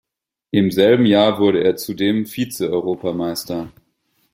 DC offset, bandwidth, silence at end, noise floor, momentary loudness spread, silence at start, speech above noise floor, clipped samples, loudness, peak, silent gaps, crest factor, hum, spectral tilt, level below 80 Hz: under 0.1%; 16.5 kHz; 0.65 s; -66 dBFS; 11 LU; 0.55 s; 49 dB; under 0.1%; -18 LUFS; -2 dBFS; none; 16 dB; none; -5.5 dB/octave; -56 dBFS